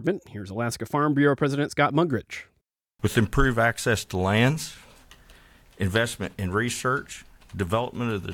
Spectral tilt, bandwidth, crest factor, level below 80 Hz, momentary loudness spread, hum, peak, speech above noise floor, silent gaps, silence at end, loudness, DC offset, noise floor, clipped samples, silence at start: -5.5 dB/octave; 18 kHz; 18 dB; -42 dBFS; 12 LU; none; -8 dBFS; 38 dB; none; 0 s; -25 LUFS; under 0.1%; -63 dBFS; under 0.1%; 0 s